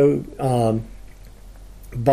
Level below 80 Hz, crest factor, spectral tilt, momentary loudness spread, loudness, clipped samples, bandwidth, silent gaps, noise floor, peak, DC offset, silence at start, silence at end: -42 dBFS; 16 dB; -8 dB/octave; 16 LU; -22 LUFS; under 0.1%; 15.5 kHz; none; -41 dBFS; -6 dBFS; under 0.1%; 0 s; 0 s